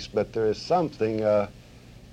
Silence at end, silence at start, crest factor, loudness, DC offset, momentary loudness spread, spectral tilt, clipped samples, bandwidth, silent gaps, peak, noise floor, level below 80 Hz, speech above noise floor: 0 s; 0 s; 16 dB; -26 LUFS; under 0.1%; 4 LU; -6.5 dB/octave; under 0.1%; 9.8 kHz; none; -12 dBFS; -48 dBFS; -52 dBFS; 23 dB